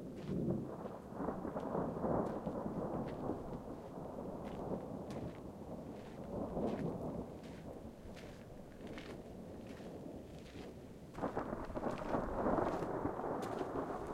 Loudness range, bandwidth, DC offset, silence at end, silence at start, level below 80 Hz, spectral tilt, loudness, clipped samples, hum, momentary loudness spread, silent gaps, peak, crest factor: 9 LU; 16 kHz; under 0.1%; 0 s; 0 s; -58 dBFS; -8 dB/octave; -43 LUFS; under 0.1%; none; 13 LU; none; -22 dBFS; 20 dB